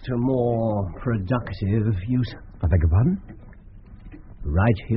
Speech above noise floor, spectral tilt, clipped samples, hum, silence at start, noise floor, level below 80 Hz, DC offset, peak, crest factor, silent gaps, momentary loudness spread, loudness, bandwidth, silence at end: 22 dB; -8.5 dB/octave; under 0.1%; none; 0 s; -43 dBFS; -34 dBFS; under 0.1%; -6 dBFS; 18 dB; none; 8 LU; -23 LUFS; 5.8 kHz; 0 s